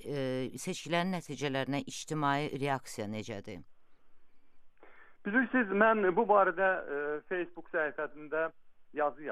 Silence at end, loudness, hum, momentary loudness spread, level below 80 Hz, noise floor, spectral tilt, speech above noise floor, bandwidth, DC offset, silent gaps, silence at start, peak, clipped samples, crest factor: 0 s; -32 LUFS; none; 14 LU; -68 dBFS; -53 dBFS; -5 dB/octave; 21 dB; 14.5 kHz; under 0.1%; none; 0 s; -14 dBFS; under 0.1%; 20 dB